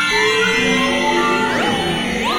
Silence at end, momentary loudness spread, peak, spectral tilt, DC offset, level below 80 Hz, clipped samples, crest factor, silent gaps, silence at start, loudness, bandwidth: 0 s; 4 LU; -4 dBFS; -3.5 dB/octave; under 0.1%; -42 dBFS; under 0.1%; 12 dB; none; 0 s; -15 LUFS; 16 kHz